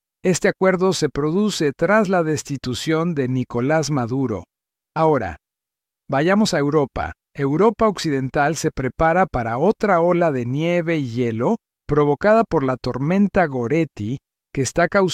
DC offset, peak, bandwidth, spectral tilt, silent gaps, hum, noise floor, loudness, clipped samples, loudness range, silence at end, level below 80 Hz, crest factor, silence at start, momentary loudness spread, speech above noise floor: under 0.1%; -4 dBFS; 15 kHz; -6 dB/octave; none; none; -87 dBFS; -20 LUFS; under 0.1%; 3 LU; 0 s; -44 dBFS; 14 dB; 0.25 s; 8 LU; 68 dB